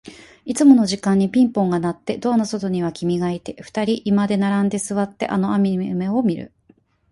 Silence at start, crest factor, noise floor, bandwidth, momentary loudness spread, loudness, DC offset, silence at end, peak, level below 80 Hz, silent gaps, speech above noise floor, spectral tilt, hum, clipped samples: 0.05 s; 18 dB; -57 dBFS; 11.5 kHz; 10 LU; -19 LUFS; under 0.1%; 0.65 s; -2 dBFS; -56 dBFS; none; 38 dB; -6.5 dB/octave; none; under 0.1%